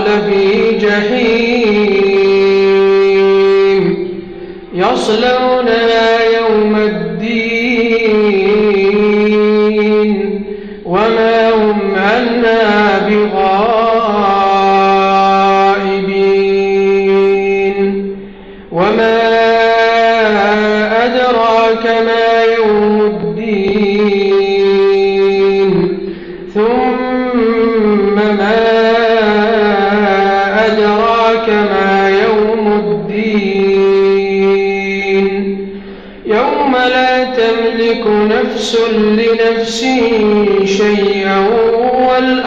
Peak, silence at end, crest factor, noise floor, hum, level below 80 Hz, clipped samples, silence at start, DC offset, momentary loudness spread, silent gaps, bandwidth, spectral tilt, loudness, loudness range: 0 dBFS; 0 s; 10 dB; -31 dBFS; none; -40 dBFS; under 0.1%; 0 s; 0.4%; 6 LU; none; 7.8 kHz; -6 dB/octave; -11 LUFS; 2 LU